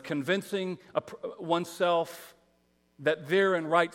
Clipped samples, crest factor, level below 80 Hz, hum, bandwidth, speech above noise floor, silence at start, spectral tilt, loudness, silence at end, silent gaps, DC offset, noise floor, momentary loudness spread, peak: under 0.1%; 22 dB; -78 dBFS; none; 16.5 kHz; 40 dB; 0.05 s; -5 dB/octave; -29 LUFS; 0.05 s; none; under 0.1%; -69 dBFS; 13 LU; -8 dBFS